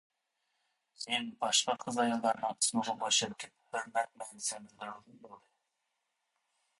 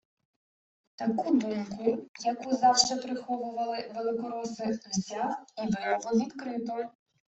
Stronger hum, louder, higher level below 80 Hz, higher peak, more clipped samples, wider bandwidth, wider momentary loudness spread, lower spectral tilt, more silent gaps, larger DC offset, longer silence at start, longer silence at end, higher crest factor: neither; second, -33 LUFS vs -30 LUFS; second, -82 dBFS vs -70 dBFS; second, -14 dBFS vs -8 dBFS; neither; first, 11.5 kHz vs 8.2 kHz; first, 16 LU vs 10 LU; second, -1 dB/octave vs -3.5 dB/octave; second, none vs 2.08-2.14 s; neither; about the same, 1 s vs 1 s; first, 1.4 s vs 0.4 s; about the same, 22 dB vs 22 dB